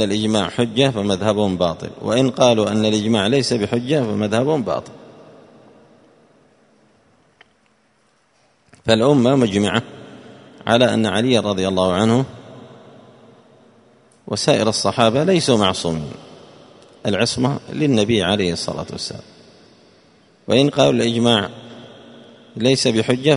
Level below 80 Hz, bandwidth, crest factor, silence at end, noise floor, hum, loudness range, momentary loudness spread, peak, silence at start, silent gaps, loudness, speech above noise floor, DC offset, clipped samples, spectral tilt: -52 dBFS; 11 kHz; 20 dB; 0 s; -60 dBFS; none; 5 LU; 13 LU; 0 dBFS; 0 s; none; -18 LUFS; 43 dB; under 0.1%; under 0.1%; -5 dB/octave